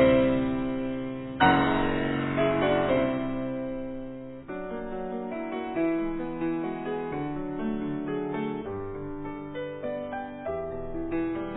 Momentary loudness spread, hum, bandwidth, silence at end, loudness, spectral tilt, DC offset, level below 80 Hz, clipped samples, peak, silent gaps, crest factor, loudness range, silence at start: 12 LU; none; 4.1 kHz; 0 s; -29 LUFS; -10.5 dB/octave; under 0.1%; -46 dBFS; under 0.1%; -8 dBFS; none; 20 dB; 7 LU; 0 s